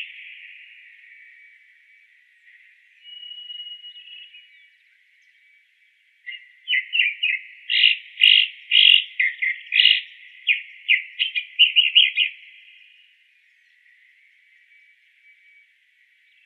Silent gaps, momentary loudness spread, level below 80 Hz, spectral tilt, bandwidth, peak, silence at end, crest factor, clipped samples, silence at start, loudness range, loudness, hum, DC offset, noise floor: none; 26 LU; under -90 dBFS; 9.5 dB/octave; 13 kHz; 0 dBFS; 4.1 s; 24 dB; under 0.1%; 0 s; 24 LU; -17 LUFS; none; under 0.1%; -61 dBFS